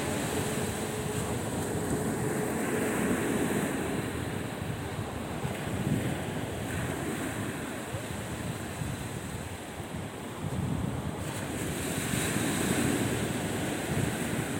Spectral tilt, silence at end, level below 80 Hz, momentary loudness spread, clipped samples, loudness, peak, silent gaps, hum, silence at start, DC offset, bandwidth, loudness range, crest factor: -5 dB/octave; 0 s; -50 dBFS; 7 LU; under 0.1%; -32 LUFS; -14 dBFS; none; none; 0 s; under 0.1%; 16.5 kHz; 5 LU; 18 dB